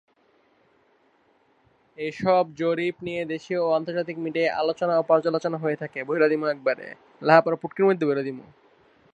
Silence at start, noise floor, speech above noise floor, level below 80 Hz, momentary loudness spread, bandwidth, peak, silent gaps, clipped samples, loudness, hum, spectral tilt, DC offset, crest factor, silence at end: 2 s; -63 dBFS; 40 dB; -70 dBFS; 11 LU; 8.2 kHz; -2 dBFS; none; under 0.1%; -24 LUFS; none; -7 dB/octave; under 0.1%; 24 dB; 0.7 s